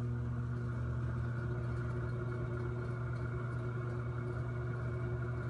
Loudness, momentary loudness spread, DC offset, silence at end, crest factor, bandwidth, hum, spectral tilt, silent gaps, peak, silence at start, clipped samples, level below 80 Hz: -39 LUFS; 1 LU; under 0.1%; 0 s; 10 dB; 4.8 kHz; none; -9 dB/octave; none; -28 dBFS; 0 s; under 0.1%; -50 dBFS